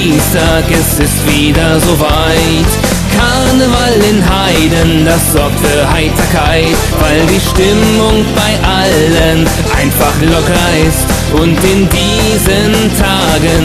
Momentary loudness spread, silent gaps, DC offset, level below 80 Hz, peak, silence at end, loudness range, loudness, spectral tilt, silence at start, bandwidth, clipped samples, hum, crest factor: 2 LU; none; 0.3%; -18 dBFS; 0 dBFS; 0 s; 0 LU; -9 LUFS; -4.5 dB/octave; 0 s; 14.5 kHz; under 0.1%; none; 8 dB